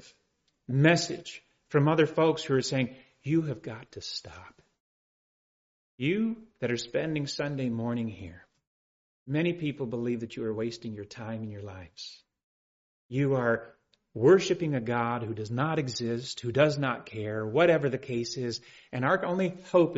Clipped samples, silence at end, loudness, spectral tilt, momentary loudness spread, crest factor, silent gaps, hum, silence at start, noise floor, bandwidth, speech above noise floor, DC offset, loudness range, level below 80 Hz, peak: under 0.1%; 0 s; -29 LUFS; -5.5 dB/octave; 16 LU; 20 dB; 4.80-5.98 s, 8.67-9.26 s, 12.44-13.09 s; none; 0.7 s; -75 dBFS; 7.6 kHz; 46 dB; under 0.1%; 8 LU; -66 dBFS; -10 dBFS